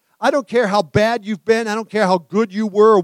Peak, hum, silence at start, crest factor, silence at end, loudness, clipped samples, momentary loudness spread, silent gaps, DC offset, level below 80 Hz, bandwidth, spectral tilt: -2 dBFS; none; 0.2 s; 16 dB; 0 s; -17 LUFS; under 0.1%; 5 LU; none; under 0.1%; -54 dBFS; 12.5 kHz; -5.5 dB/octave